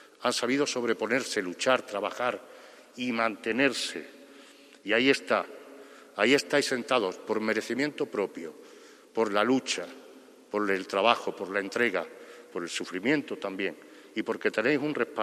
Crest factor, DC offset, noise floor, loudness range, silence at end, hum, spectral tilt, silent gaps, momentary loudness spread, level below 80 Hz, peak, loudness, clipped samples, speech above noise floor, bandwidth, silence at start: 26 dB; under 0.1%; -53 dBFS; 3 LU; 0 s; none; -3.5 dB/octave; none; 17 LU; -78 dBFS; -4 dBFS; -28 LUFS; under 0.1%; 25 dB; 14.5 kHz; 0.2 s